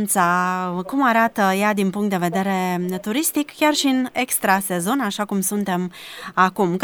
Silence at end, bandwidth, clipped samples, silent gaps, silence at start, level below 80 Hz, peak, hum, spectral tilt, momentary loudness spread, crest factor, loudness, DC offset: 0 s; over 20 kHz; under 0.1%; none; 0 s; -66 dBFS; -2 dBFS; none; -4 dB/octave; 7 LU; 18 dB; -20 LUFS; under 0.1%